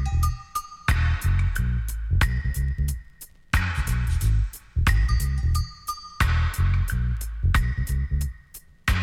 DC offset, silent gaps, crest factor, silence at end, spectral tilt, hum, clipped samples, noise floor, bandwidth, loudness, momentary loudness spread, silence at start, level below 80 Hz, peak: under 0.1%; none; 16 dB; 0 s; -5 dB/octave; none; under 0.1%; -47 dBFS; 16.5 kHz; -26 LUFS; 9 LU; 0 s; -26 dBFS; -8 dBFS